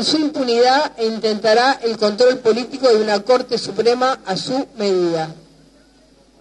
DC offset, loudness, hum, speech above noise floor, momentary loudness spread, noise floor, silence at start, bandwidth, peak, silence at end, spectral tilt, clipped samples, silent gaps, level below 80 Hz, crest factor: under 0.1%; -17 LUFS; none; 35 dB; 7 LU; -51 dBFS; 0 s; 10.5 kHz; -2 dBFS; 1 s; -4 dB/octave; under 0.1%; none; -60 dBFS; 16 dB